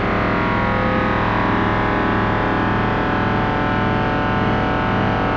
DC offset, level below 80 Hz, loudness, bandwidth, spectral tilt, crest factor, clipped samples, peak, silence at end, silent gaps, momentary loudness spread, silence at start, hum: under 0.1%; -30 dBFS; -18 LUFS; 7 kHz; -8 dB/octave; 12 dB; under 0.1%; -6 dBFS; 0 s; none; 1 LU; 0 s; none